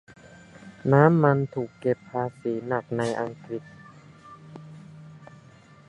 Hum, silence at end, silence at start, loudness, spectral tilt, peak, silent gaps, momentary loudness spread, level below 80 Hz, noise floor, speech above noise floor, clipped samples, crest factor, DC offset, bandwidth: none; 0.65 s; 0.65 s; -25 LUFS; -8.5 dB/octave; -2 dBFS; none; 27 LU; -64 dBFS; -52 dBFS; 28 dB; under 0.1%; 24 dB; under 0.1%; 10.5 kHz